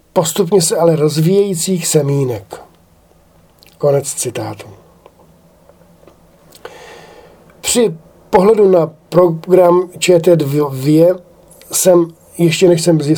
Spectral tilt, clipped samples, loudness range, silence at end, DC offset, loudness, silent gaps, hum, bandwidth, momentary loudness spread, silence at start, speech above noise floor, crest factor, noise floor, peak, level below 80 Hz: -5 dB/octave; under 0.1%; 10 LU; 0 s; under 0.1%; -13 LUFS; none; none; over 20 kHz; 14 LU; 0.15 s; 37 dB; 14 dB; -49 dBFS; 0 dBFS; -52 dBFS